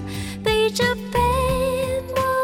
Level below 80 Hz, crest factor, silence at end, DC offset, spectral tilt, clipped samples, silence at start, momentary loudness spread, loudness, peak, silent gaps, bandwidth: -34 dBFS; 14 dB; 0 s; under 0.1%; -4.5 dB/octave; under 0.1%; 0 s; 5 LU; -21 LUFS; -8 dBFS; none; 17.5 kHz